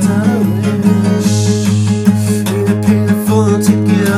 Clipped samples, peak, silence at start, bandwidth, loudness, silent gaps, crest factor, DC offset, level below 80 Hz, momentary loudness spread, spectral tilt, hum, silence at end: under 0.1%; 0 dBFS; 0 s; 15.5 kHz; -12 LUFS; none; 10 dB; under 0.1%; -50 dBFS; 3 LU; -6.5 dB/octave; none; 0 s